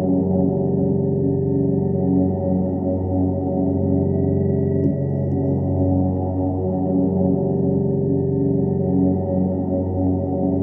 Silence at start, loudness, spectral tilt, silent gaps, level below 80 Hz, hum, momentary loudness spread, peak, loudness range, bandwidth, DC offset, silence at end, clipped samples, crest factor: 0 s; -20 LUFS; -15 dB/octave; none; -46 dBFS; none; 3 LU; -6 dBFS; 1 LU; 2.1 kHz; under 0.1%; 0 s; under 0.1%; 12 dB